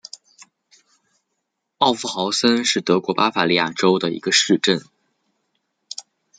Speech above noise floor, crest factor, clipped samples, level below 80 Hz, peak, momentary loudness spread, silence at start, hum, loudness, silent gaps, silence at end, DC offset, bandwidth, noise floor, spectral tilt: 58 dB; 20 dB; under 0.1%; -66 dBFS; -2 dBFS; 18 LU; 1.8 s; none; -18 LUFS; none; 0.35 s; under 0.1%; 9.6 kHz; -76 dBFS; -3 dB/octave